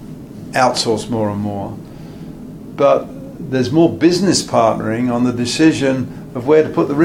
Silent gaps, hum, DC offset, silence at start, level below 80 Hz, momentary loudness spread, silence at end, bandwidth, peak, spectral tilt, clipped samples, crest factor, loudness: none; none; under 0.1%; 0 s; -46 dBFS; 19 LU; 0 s; 14 kHz; 0 dBFS; -5 dB/octave; under 0.1%; 16 dB; -16 LUFS